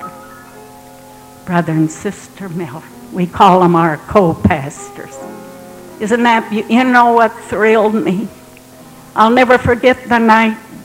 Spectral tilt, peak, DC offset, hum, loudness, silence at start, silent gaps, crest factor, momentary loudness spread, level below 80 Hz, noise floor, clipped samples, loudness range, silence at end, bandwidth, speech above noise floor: -6 dB/octave; 0 dBFS; under 0.1%; none; -12 LUFS; 0 s; none; 14 dB; 21 LU; -42 dBFS; -38 dBFS; 0.1%; 3 LU; 0 s; 16.5 kHz; 26 dB